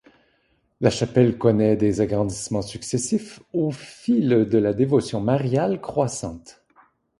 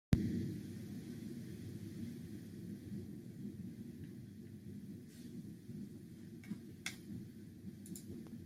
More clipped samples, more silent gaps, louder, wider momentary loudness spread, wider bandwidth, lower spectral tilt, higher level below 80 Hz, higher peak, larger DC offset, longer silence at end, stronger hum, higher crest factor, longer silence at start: neither; neither; first, -22 LUFS vs -48 LUFS; about the same, 9 LU vs 8 LU; second, 11.5 kHz vs 16 kHz; about the same, -6.5 dB/octave vs -6.5 dB/octave; first, -50 dBFS vs -60 dBFS; first, -4 dBFS vs -16 dBFS; neither; first, 0.7 s vs 0 s; neither; second, 18 dB vs 30 dB; first, 0.8 s vs 0.1 s